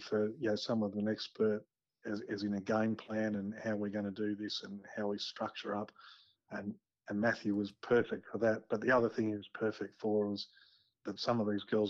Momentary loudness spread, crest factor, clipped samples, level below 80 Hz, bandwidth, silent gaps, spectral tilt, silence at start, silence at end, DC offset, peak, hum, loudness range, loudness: 11 LU; 16 dB; under 0.1%; -76 dBFS; 7.4 kHz; none; -6 dB/octave; 0 s; 0 s; under 0.1%; -20 dBFS; none; 5 LU; -36 LUFS